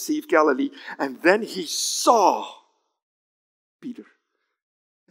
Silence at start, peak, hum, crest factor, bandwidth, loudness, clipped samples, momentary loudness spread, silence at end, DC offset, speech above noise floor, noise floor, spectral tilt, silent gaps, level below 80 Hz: 0 s; -2 dBFS; none; 22 dB; 16 kHz; -21 LUFS; under 0.1%; 21 LU; 1.1 s; under 0.1%; 53 dB; -74 dBFS; -2 dB/octave; 3.02-3.79 s; under -90 dBFS